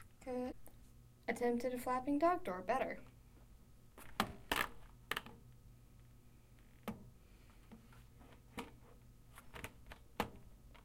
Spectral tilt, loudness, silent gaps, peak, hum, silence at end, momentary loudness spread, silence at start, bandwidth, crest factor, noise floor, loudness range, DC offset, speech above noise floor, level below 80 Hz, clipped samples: -4.5 dB/octave; -42 LUFS; none; -18 dBFS; none; 0.05 s; 25 LU; 0 s; 16.5 kHz; 26 dB; -63 dBFS; 16 LU; under 0.1%; 24 dB; -62 dBFS; under 0.1%